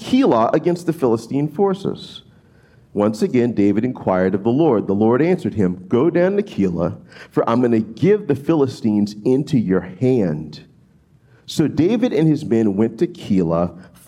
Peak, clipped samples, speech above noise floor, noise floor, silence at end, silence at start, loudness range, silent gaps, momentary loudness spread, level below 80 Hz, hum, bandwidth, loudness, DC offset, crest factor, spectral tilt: -4 dBFS; under 0.1%; 35 dB; -53 dBFS; 0.25 s; 0 s; 3 LU; none; 8 LU; -56 dBFS; none; 14 kHz; -18 LUFS; under 0.1%; 14 dB; -8 dB/octave